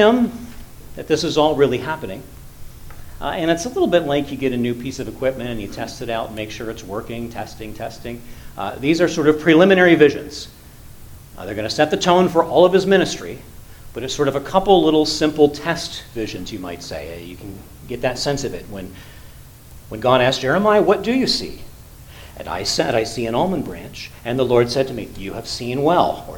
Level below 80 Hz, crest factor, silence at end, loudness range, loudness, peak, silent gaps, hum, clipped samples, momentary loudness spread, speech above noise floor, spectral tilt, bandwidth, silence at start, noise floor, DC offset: -42 dBFS; 20 dB; 0 s; 10 LU; -18 LUFS; 0 dBFS; none; none; under 0.1%; 20 LU; 22 dB; -5 dB/octave; 19 kHz; 0 s; -40 dBFS; under 0.1%